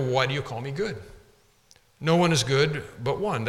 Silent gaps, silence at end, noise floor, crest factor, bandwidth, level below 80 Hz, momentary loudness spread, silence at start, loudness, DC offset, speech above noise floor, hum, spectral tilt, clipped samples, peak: none; 0 s; -60 dBFS; 18 dB; 14.5 kHz; -54 dBFS; 11 LU; 0 s; -25 LUFS; under 0.1%; 35 dB; none; -5 dB/octave; under 0.1%; -8 dBFS